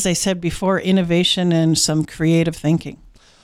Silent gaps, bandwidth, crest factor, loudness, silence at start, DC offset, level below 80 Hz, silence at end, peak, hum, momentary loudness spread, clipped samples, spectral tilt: none; 14.5 kHz; 12 dB; -18 LUFS; 0 s; under 0.1%; -44 dBFS; 0.5 s; -6 dBFS; none; 5 LU; under 0.1%; -4.5 dB/octave